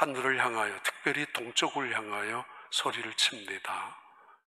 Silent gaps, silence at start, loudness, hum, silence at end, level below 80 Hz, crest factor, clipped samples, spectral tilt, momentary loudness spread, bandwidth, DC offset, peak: none; 0 s; -31 LUFS; none; 0.25 s; -84 dBFS; 24 dB; under 0.1%; -1.5 dB/octave; 9 LU; 15.5 kHz; under 0.1%; -8 dBFS